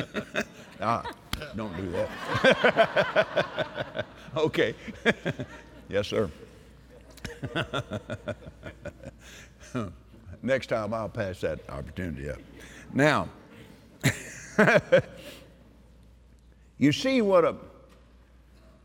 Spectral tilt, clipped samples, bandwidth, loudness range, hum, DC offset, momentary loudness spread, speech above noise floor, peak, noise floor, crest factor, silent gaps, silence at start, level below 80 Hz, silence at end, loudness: -5.5 dB/octave; under 0.1%; 17.5 kHz; 9 LU; none; under 0.1%; 21 LU; 28 dB; -6 dBFS; -55 dBFS; 22 dB; none; 0 s; -54 dBFS; 1.15 s; -27 LUFS